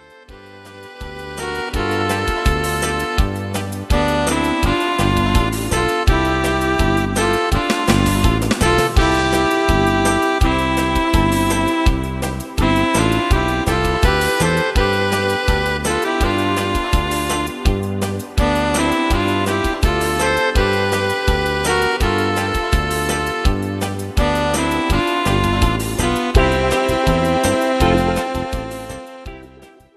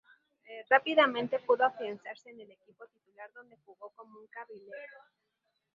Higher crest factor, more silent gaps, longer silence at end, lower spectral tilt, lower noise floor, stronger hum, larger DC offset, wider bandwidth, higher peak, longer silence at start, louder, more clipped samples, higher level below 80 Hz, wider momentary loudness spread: second, 18 dB vs 26 dB; neither; second, 0.3 s vs 0.9 s; first, -5 dB/octave vs -0.5 dB/octave; second, -44 dBFS vs -57 dBFS; neither; neither; first, 13 kHz vs 7.2 kHz; first, 0 dBFS vs -8 dBFS; second, 0.3 s vs 0.5 s; first, -17 LUFS vs -28 LUFS; neither; first, -24 dBFS vs -84 dBFS; second, 7 LU vs 25 LU